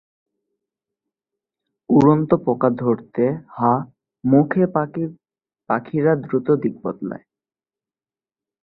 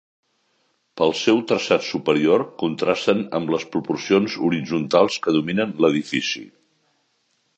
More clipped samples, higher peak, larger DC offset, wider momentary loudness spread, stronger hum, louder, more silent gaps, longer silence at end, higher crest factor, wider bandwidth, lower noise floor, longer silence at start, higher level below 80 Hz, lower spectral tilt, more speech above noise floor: neither; about the same, -2 dBFS vs -2 dBFS; neither; first, 13 LU vs 6 LU; neither; about the same, -20 LUFS vs -21 LUFS; neither; first, 1.45 s vs 1.1 s; about the same, 20 dB vs 20 dB; second, 6.8 kHz vs 8.4 kHz; first, under -90 dBFS vs -68 dBFS; first, 1.9 s vs 0.95 s; about the same, -60 dBFS vs -62 dBFS; first, -10.5 dB/octave vs -5 dB/octave; first, over 72 dB vs 48 dB